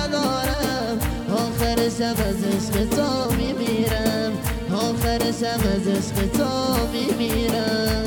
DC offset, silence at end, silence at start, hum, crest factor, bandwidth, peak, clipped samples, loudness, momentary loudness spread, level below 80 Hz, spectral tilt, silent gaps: under 0.1%; 0 s; 0 s; none; 16 dB; over 20 kHz; -6 dBFS; under 0.1%; -22 LUFS; 3 LU; -34 dBFS; -5 dB/octave; none